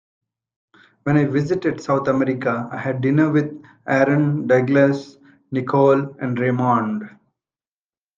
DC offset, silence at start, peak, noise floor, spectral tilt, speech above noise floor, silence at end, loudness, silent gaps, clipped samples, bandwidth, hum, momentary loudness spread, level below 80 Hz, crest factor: under 0.1%; 1.05 s; -2 dBFS; under -90 dBFS; -8.5 dB/octave; over 71 dB; 1.1 s; -19 LUFS; none; under 0.1%; 7.6 kHz; none; 11 LU; -62 dBFS; 18 dB